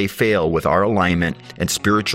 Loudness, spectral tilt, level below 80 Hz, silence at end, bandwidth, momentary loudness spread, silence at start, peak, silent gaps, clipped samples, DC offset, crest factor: -18 LUFS; -4.5 dB/octave; -44 dBFS; 0 s; 16 kHz; 6 LU; 0 s; -2 dBFS; none; under 0.1%; under 0.1%; 16 dB